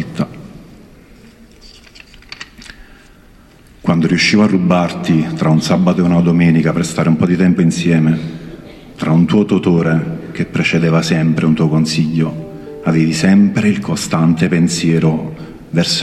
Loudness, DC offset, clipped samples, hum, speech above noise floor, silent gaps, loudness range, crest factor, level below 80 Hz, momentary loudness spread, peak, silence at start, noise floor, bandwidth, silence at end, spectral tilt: -14 LUFS; under 0.1%; under 0.1%; none; 31 dB; none; 4 LU; 12 dB; -44 dBFS; 16 LU; -2 dBFS; 0 s; -43 dBFS; 12.5 kHz; 0 s; -6 dB/octave